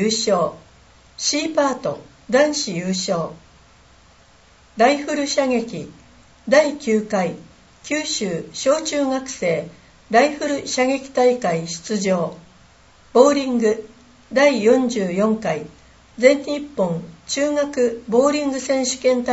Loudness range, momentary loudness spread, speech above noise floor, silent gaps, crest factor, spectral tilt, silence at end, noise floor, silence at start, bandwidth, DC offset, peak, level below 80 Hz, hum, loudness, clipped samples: 4 LU; 10 LU; 32 dB; none; 20 dB; -4 dB/octave; 0 s; -51 dBFS; 0 s; 8.2 kHz; under 0.1%; 0 dBFS; -56 dBFS; none; -20 LUFS; under 0.1%